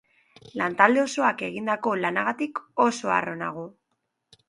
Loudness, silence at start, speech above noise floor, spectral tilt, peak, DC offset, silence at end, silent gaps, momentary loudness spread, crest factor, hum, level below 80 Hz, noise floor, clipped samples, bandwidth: -24 LUFS; 0.45 s; 53 dB; -4.5 dB/octave; -2 dBFS; under 0.1%; 0.8 s; none; 13 LU; 24 dB; none; -72 dBFS; -77 dBFS; under 0.1%; 11.5 kHz